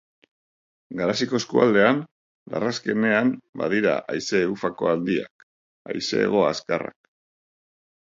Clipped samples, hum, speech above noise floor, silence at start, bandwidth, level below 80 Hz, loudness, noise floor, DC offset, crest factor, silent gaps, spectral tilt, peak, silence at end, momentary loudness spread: under 0.1%; none; over 68 dB; 0.9 s; 7.8 kHz; -64 dBFS; -23 LUFS; under -90 dBFS; under 0.1%; 22 dB; 2.11-2.46 s, 3.49-3.53 s, 5.30-5.85 s; -5 dB/octave; -4 dBFS; 1.2 s; 11 LU